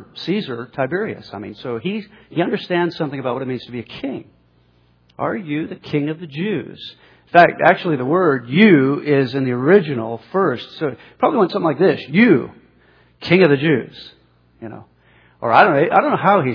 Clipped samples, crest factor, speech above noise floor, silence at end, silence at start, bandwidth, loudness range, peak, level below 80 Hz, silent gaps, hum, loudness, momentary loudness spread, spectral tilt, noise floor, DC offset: under 0.1%; 18 dB; 39 dB; 0 s; 0 s; 5.4 kHz; 10 LU; 0 dBFS; -62 dBFS; none; none; -17 LUFS; 18 LU; -8.5 dB/octave; -56 dBFS; under 0.1%